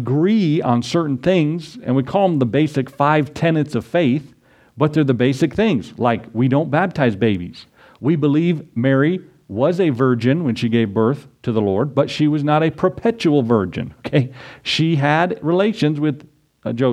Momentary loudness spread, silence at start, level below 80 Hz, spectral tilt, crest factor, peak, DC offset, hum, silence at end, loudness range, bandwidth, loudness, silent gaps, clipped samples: 7 LU; 0 s; -54 dBFS; -7.5 dB/octave; 18 dB; 0 dBFS; under 0.1%; none; 0 s; 1 LU; 10.5 kHz; -18 LUFS; none; under 0.1%